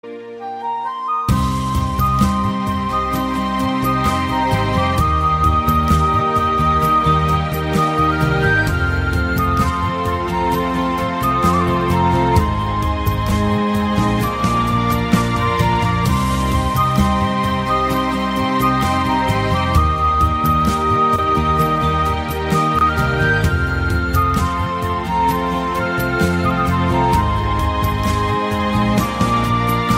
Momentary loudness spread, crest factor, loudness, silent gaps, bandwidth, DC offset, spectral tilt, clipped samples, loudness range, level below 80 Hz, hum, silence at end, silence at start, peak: 4 LU; 16 dB; -17 LUFS; none; 16 kHz; under 0.1%; -6 dB/octave; under 0.1%; 2 LU; -26 dBFS; none; 0 s; 0.05 s; -2 dBFS